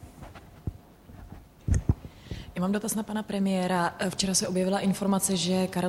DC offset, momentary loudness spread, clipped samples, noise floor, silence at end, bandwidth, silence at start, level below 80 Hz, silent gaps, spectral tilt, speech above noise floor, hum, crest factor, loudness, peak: under 0.1%; 21 LU; under 0.1%; -49 dBFS; 0 s; 15.5 kHz; 0 s; -40 dBFS; none; -4.5 dB/octave; 22 dB; none; 18 dB; -28 LUFS; -10 dBFS